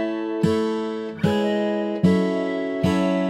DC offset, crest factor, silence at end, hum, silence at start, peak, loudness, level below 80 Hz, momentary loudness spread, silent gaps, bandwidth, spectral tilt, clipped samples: under 0.1%; 16 dB; 0 s; none; 0 s; -6 dBFS; -22 LUFS; -54 dBFS; 6 LU; none; 12 kHz; -7.5 dB/octave; under 0.1%